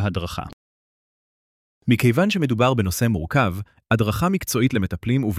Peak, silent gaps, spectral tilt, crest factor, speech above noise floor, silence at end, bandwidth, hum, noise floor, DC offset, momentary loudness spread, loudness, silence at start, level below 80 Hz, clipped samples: -4 dBFS; 0.53-1.81 s; -6 dB/octave; 16 dB; over 70 dB; 0 s; 16 kHz; none; under -90 dBFS; under 0.1%; 12 LU; -21 LUFS; 0 s; -44 dBFS; under 0.1%